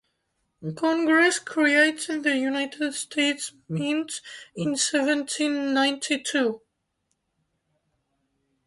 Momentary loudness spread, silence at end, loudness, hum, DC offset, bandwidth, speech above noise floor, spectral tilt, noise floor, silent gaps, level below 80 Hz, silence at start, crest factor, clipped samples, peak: 13 LU; 2.1 s; -24 LUFS; none; under 0.1%; 11.5 kHz; 52 dB; -3 dB/octave; -76 dBFS; none; -72 dBFS; 0.6 s; 20 dB; under 0.1%; -6 dBFS